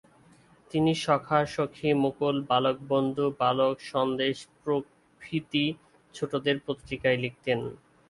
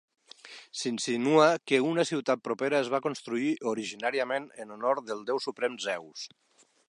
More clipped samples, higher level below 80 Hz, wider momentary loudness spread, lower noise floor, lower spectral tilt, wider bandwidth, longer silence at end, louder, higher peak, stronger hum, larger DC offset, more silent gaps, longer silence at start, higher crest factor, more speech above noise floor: neither; first, -62 dBFS vs -84 dBFS; second, 9 LU vs 17 LU; first, -58 dBFS vs -50 dBFS; first, -6 dB/octave vs -4 dB/octave; about the same, 11.5 kHz vs 11.5 kHz; second, 0.35 s vs 0.6 s; about the same, -28 LUFS vs -29 LUFS; about the same, -8 dBFS vs -8 dBFS; neither; neither; neither; first, 0.75 s vs 0.45 s; about the same, 20 dB vs 22 dB; first, 31 dB vs 22 dB